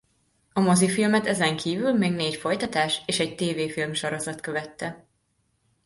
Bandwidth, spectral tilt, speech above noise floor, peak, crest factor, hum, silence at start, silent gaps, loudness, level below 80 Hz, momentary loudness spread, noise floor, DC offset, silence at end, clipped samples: 12 kHz; -4.5 dB/octave; 46 dB; -8 dBFS; 16 dB; none; 0.55 s; none; -25 LUFS; -62 dBFS; 11 LU; -71 dBFS; under 0.1%; 0.9 s; under 0.1%